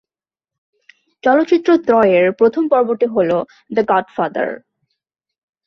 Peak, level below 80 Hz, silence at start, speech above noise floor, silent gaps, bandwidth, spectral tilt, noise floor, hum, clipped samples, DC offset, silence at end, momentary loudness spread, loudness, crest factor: -2 dBFS; -62 dBFS; 1.25 s; over 76 dB; none; 6.4 kHz; -7.5 dB/octave; under -90 dBFS; none; under 0.1%; under 0.1%; 1.1 s; 9 LU; -15 LUFS; 14 dB